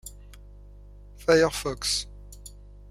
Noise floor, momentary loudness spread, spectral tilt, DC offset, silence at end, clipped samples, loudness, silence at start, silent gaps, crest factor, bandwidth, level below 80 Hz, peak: -47 dBFS; 24 LU; -3 dB/octave; under 0.1%; 0.2 s; under 0.1%; -25 LUFS; 0.05 s; none; 22 dB; 16 kHz; -46 dBFS; -6 dBFS